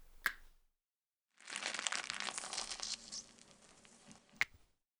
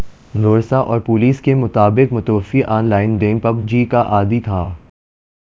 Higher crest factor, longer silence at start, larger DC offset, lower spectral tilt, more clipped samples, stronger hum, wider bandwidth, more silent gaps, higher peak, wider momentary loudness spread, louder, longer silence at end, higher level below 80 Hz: first, 32 dB vs 14 dB; about the same, 0 s vs 0 s; neither; second, 1 dB/octave vs -9.5 dB/octave; neither; neither; first, over 20 kHz vs 7.2 kHz; neither; second, -14 dBFS vs 0 dBFS; first, 22 LU vs 6 LU; second, -41 LUFS vs -15 LUFS; second, 0.45 s vs 0.75 s; second, -68 dBFS vs -36 dBFS